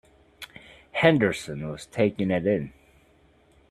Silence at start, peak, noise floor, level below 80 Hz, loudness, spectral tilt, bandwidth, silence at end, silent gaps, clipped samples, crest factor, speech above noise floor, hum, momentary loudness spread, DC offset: 0.4 s; -4 dBFS; -60 dBFS; -58 dBFS; -25 LUFS; -6.5 dB/octave; 14 kHz; 1 s; none; under 0.1%; 24 dB; 36 dB; none; 23 LU; under 0.1%